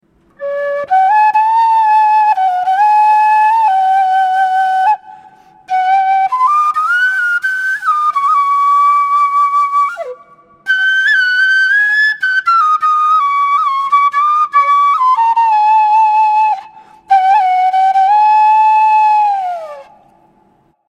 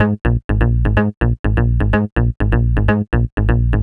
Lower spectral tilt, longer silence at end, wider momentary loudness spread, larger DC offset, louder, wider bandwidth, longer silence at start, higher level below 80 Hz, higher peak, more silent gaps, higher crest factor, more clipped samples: second, 0.5 dB/octave vs -10 dB/octave; first, 1.05 s vs 0 s; first, 6 LU vs 3 LU; neither; first, -11 LUFS vs -17 LUFS; first, 11 kHz vs 3.9 kHz; first, 0.4 s vs 0 s; second, -68 dBFS vs -18 dBFS; about the same, 0 dBFS vs 0 dBFS; second, none vs 0.44-0.49 s, 1.17-1.21 s, 1.39-1.44 s, 2.12-2.16 s, 3.32-3.37 s; about the same, 10 dB vs 14 dB; neither